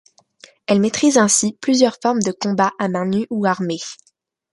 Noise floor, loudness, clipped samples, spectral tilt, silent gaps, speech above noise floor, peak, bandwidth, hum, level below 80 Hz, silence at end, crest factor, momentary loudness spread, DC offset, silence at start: -49 dBFS; -18 LUFS; under 0.1%; -4 dB/octave; none; 31 dB; -2 dBFS; 11.5 kHz; none; -62 dBFS; 0.6 s; 18 dB; 9 LU; under 0.1%; 0.7 s